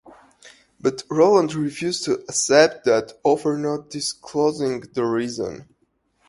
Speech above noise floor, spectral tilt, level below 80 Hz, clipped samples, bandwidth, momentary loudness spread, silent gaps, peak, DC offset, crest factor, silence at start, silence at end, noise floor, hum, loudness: 47 dB; -4 dB/octave; -62 dBFS; under 0.1%; 11.5 kHz; 11 LU; none; -2 dBFS; under 0.1%; 20 dB; 0.45 s; 0.65 s; -67 dBFS; none; -21 LUFS